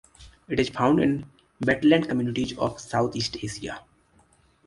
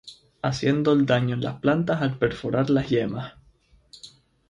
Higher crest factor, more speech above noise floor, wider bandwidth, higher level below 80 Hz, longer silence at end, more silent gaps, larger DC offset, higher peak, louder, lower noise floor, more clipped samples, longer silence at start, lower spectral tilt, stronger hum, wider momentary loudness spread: about the same, 20 dB vs 18 dB; about the same, 37 dB vs 36 dB; about the same, 11.5 kHz vs 10.5 kHz; about the same, -54 dBFS vs -52 dBFS; first, 0.85 s vs 0.4 s; neither; neither; about the same, -6 dBFS vs -6 dBFS; about the same, -25 LUFS vs -24 LUFS; about the same, -61 dBFS vs -59 dBFS; neither; first, 0.2 s vs 0.05 s; second, -5.5 dB/octave vs -7 dB/octave; neither; second, 13 LU vs 17 LU